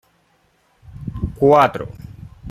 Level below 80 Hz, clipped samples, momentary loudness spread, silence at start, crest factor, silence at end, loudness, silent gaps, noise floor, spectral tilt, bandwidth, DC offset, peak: -40 dBFS; under 0.1%; 25 LU; 0.95 s; 18 dB; 0 s; -16 LUFS; none; -60 dBFS; -7.5 dB/octave; 15 kHz; under 0.1%; -2 dBFS